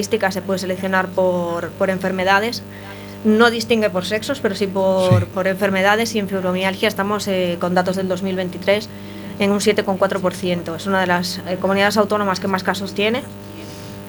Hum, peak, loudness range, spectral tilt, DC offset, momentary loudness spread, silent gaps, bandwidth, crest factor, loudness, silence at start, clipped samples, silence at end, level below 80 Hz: 50 Hz at -35 dBFS; 0 dBFS; 2 LU; -5 dB/octave; under 0.1%; 9 LU; none; 19 kHz; 18 dB; -19 LUFS; 0 s; under 0.1%; 0 s; -52 dBFS